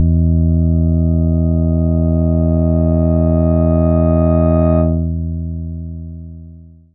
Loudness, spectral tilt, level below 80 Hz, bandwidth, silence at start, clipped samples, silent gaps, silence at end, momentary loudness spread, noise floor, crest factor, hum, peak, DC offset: -14 LUFS; -16 dB/octave; -26 dBFS; 2.6 kHz; 0 s; under 0.1%; none; 0.25 s; 13 LU; -38 dBFS; 12 dB; none; -2 dBFS; under 0.1%